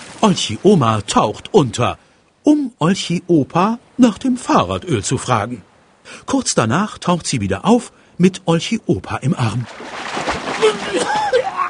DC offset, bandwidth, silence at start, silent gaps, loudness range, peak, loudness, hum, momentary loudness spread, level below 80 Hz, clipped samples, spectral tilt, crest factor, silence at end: under 0.1%; 10.5 kHz; 0 s; none; 3 LU; 0 dBFS; -17 LUFS; none; 7 LU; -48 dBFS; under 0.1%; -5 dB/octave; 16 dB; 0 s